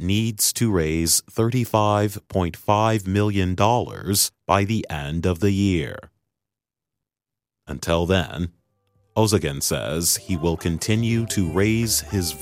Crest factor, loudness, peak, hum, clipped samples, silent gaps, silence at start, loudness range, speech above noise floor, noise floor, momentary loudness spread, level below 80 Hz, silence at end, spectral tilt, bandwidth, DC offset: 20 dB; -21 LUFS; -2 dBFS; none; under 0.1%; none; 0 s; 6 LU; 67 dB; -88 dBFS; 6 LU; -42 dBFS; 0 s; -4.5 dB/octave; 16 kHz; under 0.1%